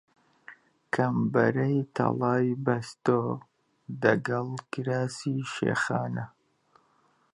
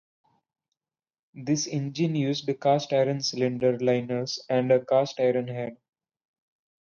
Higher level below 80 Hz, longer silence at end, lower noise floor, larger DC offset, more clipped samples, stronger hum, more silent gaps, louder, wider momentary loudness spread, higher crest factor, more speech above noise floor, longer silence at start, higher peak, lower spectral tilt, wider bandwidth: about the same, -70 dBFS vs -72 dBFS; about the same, 1.05 s vs 1.1 s; second, -67 dBFS vs -86 dBFS; neither; neither; neither; neither; about the same, -28 LUFS vs -26 LUFS; first, 10 LU vs 7 LU; about the same, 22 dB vs 18 dB; second, 40 dB vs 61 dB; second, 0.5 s vs 1.35 s; about the same, -6 dBFS vs -8 dBFS; first, -7 dB/octave vs -5.5 dB/octave; first, 11.5 kHz vs 7.2 kHz